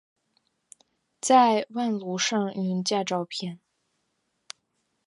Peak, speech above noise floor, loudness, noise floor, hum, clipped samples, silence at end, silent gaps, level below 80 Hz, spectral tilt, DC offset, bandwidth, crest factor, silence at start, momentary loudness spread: -8 dBFS; 51 dB; -25 LUFS; -76 dBFS; none; under 0.1%; 1.5 s; none; -80 dBFS; -4 dB/octave; under 0.1%; 11.5 kHz; 20 dB; 1.25 s; 26 LU